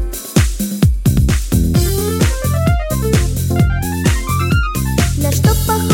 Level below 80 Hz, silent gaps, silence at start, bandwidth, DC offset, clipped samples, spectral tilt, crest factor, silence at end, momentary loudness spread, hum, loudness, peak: -20 dBFS; none; 0 s; 17 kHz; under 0.1%; under 0.1%; -5.5 dB/octave; 14 dB; 0 s; 3 LU; none; -15 LUFS; 0 dBFS